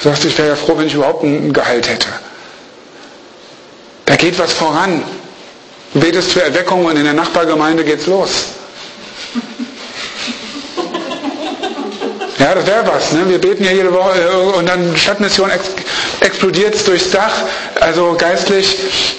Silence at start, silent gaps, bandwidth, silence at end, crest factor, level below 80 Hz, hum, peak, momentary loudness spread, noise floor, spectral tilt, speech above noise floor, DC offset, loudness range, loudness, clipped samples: 0 s; none; 8.8 kHz; 0 s; 14 dB; -46 dBFS; none; 0 dBFS; 12 LU; -37 dBFS; -4 dB/octave; 25 dB; under 0.1%; 7 LU; -13 LUFS; under 0.1%